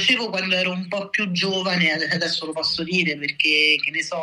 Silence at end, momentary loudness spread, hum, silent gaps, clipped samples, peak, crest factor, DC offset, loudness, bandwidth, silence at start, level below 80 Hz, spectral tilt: 0 s; 7 LU; none; none; under 0.1%; -4 dBFS; 18 dB; under 0.1%; -20 LUFS; 12 kHz; 0 s; -64 dBFS; -3.5 dB/octave